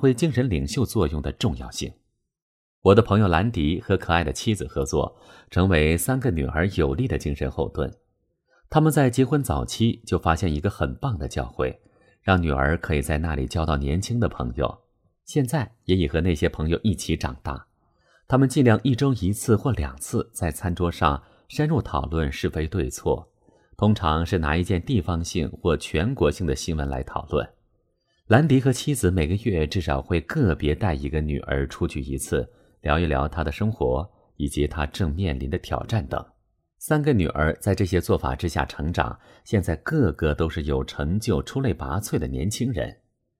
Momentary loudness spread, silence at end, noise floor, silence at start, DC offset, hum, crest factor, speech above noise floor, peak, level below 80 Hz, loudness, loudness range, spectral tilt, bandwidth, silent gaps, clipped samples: 9 LU; 0.45 s; -69 dBFS; 0 s; under 0.1%; none; 22 dB; 46 dB; -2 dBFS; -34 dBFS; -24 LUFS; 3 LU; -6 dB/octave; 15.5 kHz; 2.42-2.82 s; under 0.1%